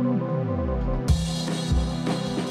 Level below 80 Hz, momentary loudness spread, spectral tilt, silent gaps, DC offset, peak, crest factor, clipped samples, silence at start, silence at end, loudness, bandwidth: -30 dBFS; 3 LU; -6.5 dB/octave; none; under 0.1%; -10 dBFS; 16 dB; under 0.1%; 0 s; 0 s; -26 LUFS; 13 kHz